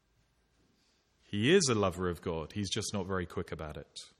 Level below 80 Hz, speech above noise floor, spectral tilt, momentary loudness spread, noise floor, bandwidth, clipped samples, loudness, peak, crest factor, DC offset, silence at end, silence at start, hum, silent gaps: -58 dBFS; 40 dB; -4.5 dB/octave; 16 LU; -72 dBFS; 14 kHz; under 0.1%; -32 LUFS; -14 dBFS; 20 dB; under 0.1%; 0.1 s; 1.3 s; none; none